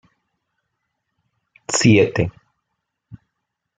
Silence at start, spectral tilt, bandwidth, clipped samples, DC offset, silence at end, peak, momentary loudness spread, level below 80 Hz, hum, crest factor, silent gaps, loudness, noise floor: 1.7 s; -5 dB/octave; 9.6 kHz; under 0.1%; under 0.1%; 0.65 s; -2 dBFS; 13 LU; -52 dBFS; none; 22 dB; none; -17 LUFS; -78 dBFS